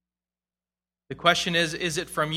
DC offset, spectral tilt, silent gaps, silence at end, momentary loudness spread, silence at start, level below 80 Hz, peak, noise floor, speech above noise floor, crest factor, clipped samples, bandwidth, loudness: under 0.1%; -3 dB/octave; none; 0 s; 7 LU; 1.1 s; -58 dBFS; -4 dBFS; under -90 dBFS; over 65 dB; 24 dB; under 0.1%; 16 kHz; -24 LUFS